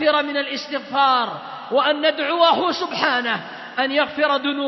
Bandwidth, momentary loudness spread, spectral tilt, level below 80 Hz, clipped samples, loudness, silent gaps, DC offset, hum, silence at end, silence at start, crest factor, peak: 6.2 kHz; 10 LU; -4 dB/octave; -70 dBFS; under 0.1%; -20 LUFS; none; under 0.1%; none; 0 s; 0 s; 18 dB; -2 dBFS